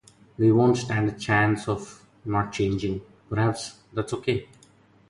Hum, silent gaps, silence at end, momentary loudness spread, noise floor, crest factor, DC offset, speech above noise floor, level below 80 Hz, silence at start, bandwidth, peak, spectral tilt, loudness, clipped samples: none; none; 0.65 s; 12 LU; -57 dBFS; 16 dB; under 0.1%; 33 dB; -52 dBFS; 0.4 s; 11.5 kHz; -10 dBFS; -6.5 dB/octave; -25 LUFS; under 0.1%